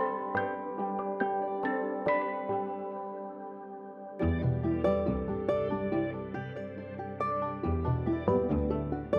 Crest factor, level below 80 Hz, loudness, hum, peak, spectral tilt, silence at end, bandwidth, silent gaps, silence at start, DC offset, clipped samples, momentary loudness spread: 20 dB; -46 dBFS; -32 LUFS; none; -12 dBFS; -10 dB/octave; 0 s; 6.4 kHz; none; 0 s; under 0.1%; under 0.1%; 12 LU